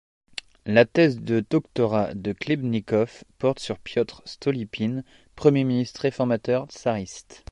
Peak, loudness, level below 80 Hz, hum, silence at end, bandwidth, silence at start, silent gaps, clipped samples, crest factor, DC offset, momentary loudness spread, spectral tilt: -4 dBFS; -24 LUFS; -56 dBFS; none; 0.15 s; 11 kHz; 0.65 s; none; under 0.1%; 20 dB; under 0.1%; 11 LU; -6.5 dB/octave